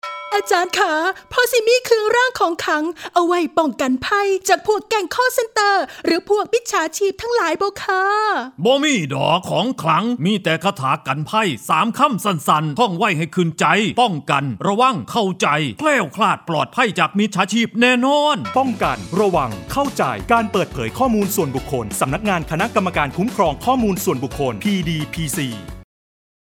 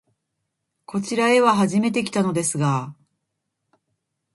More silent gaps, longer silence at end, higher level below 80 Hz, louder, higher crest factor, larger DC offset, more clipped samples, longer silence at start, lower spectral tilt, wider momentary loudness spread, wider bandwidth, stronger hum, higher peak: neither; second, 0.7 s vs 1.4 s; first, -44 dBFS vs -66 dBFS; about the same, -18 LUFS vs -20 LUFS; about the same, 18 dB vs 18 dB; neither; neither; second, 0.05 s vs 0.9 s; about the same, -4.5 dB/octave vs -5 dB/octave; second, 6 LU vs 12 LU; first, 19 kHz vs 11.5 kHz; neither; first, 0 dBFS vs -4 dBFS